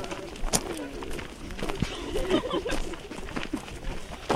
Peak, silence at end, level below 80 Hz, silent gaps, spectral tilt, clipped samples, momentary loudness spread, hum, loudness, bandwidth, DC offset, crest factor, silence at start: -4 dBFS; 0 s; -38 dBFS; none; -3.5 dB/octave; under 0.1%; 11 LU; none; -32 LUFS; 15.5 kHz; under 0.1%; 26 dB; 0 s